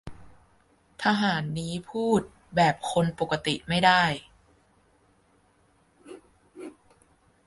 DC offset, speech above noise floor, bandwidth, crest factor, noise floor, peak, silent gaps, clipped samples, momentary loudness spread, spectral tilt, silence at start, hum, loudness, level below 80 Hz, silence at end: under 0.1%; 39 dB; 11.5 kHz; 24 dB; -64 dBFS; -6 dBFS; none; under 0.1%; 24 LU; -5 dB/octave; 0.05 s; none; -25 LUFS; -58 dBFS; 0.75 s